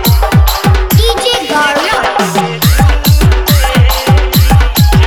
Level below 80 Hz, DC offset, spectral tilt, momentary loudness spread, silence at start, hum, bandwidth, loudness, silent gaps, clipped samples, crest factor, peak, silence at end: -12 dBFS; under 0.1%; -5 dB/octave; 3 LU; 0 s; none; over 20 kHz; -9 LUFS; none; 0.5%; 8 dB; 0 dBFS; 0 s